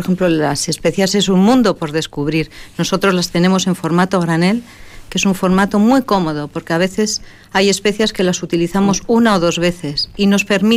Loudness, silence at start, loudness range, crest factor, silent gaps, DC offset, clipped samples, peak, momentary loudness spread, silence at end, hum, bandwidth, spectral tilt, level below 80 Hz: -15 LUFS; 0 s; 1 LU; 12 dB; none; under 0.1%; under 0.1%; -2 dBFS; 8 LU; 0 s; none; 15.5 kHz; -5 dB/octave; -40 dBFS